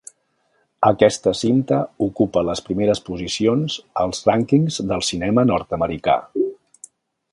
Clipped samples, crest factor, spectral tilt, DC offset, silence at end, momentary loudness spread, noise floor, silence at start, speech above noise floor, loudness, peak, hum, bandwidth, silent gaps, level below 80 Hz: under 0.1%; 20 dB; -5.5 dB/octave; under 0.1%; 0.8 s; 7 LU; -66 dBFS; 0.8 s; 47 dB; -20 LUFS; 0 dBFS; none; 11.5 kHz; none; -48 dBFS